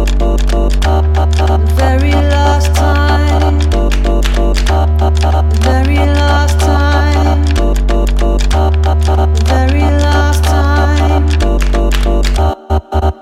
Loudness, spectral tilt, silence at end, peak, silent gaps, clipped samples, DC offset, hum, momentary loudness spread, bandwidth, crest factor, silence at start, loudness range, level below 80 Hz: -12 LUFS; -6 dB/octave; 0.1 s; 0 dBFS; none; under 0.1%; under 0.1%; none; 3 LU; 13 kHz; 10 dB; 0 s; 1 LU; -10 dBFS